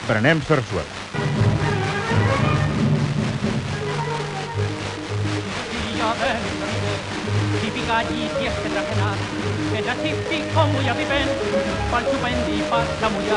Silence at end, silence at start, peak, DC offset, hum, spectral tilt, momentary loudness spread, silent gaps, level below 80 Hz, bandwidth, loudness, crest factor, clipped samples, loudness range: 0 s; 0 s; -4 dBFS; under 0.1%; none; -5.5 dB/octave; 6 LU; none; -40 dBFS; 11 kHz; -22 LUFS; 18 dB; under 0.1%; 3 LU